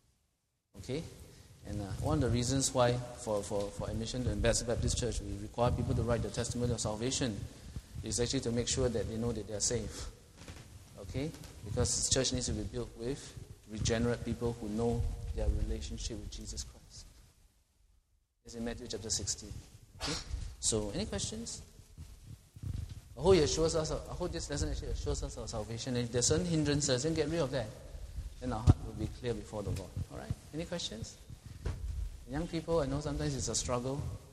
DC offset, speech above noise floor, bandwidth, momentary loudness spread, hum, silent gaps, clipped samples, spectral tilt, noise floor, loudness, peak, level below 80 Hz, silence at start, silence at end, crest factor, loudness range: under 0.1%; 45 dB; 14 kHz; 17 LU; none; none; under 0.1%; -4.5 dB/octave; -80 dBFS; -35 LUFS; -8 dBFS; -44 dBFS; 0.75 s; 0 s; 26 dB; 7 LU